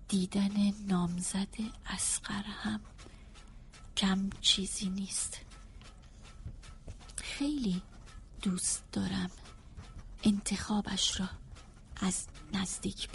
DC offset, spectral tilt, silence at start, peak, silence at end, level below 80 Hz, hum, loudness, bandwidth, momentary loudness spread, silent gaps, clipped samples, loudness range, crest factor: under 0.1%; -3.5 dB/octave; 0 s; -12 dBFS; 0 s; -50 dBFS; none; -34 LUFS; 11.5 kHz; 23 LU; none; under 0.1%; 5 LU; 22 dB